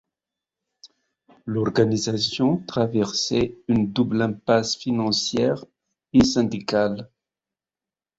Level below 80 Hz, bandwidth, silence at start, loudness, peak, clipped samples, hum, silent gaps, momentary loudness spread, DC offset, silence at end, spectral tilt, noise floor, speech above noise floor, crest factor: -52 dBFS; 8 kHz; 0.85 s; -22 LUFS; -4 dBFS; under 0.1%; none; none; 5 LU; under 0.1%; 1.15 s; -5 dB/octave; under -90 dBFS; over 68 dB; 18 dB